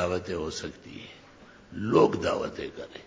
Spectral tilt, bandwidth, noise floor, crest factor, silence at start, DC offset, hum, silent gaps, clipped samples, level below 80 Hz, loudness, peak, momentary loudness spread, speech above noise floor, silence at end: -5.5 dB/octave; 7.8 kHz; -52 dBFS; 22 dB; 0 s; under 0.1%; none; none; under 0.1%; -52 dBFS; -28 LUFS; -8 dBFS; 21 LU; 24 dB; 0.05 s